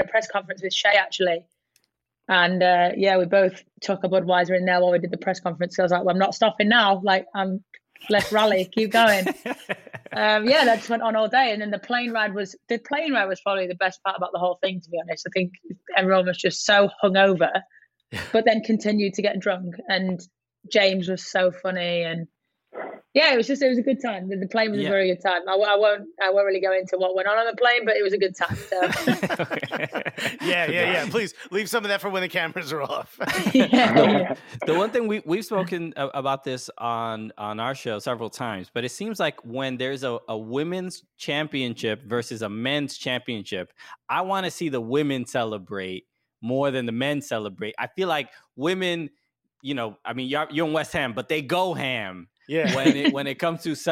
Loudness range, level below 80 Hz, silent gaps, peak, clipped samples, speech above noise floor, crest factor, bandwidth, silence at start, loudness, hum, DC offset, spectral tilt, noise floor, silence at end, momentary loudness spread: 7 LU; -66 dBFS; none; -4 dBFS; under 0.1%; 52 dB; 20 dB; 16.5 kHz; 0 s; -23 LUFS; none; under 0.1%; -4.5 dB/octave; -75 dBFS; 0 s; 12 LU